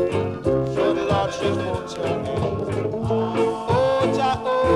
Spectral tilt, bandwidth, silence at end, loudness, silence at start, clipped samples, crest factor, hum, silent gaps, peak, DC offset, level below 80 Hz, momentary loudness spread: -6.5 dB/octave; 11.5 kHz; 0 s; -22 LUFS; 0 s; under 0.1%; 14 dB; none; none; -8 dBFS; under 0.1%; -44 dBFS; 5 LU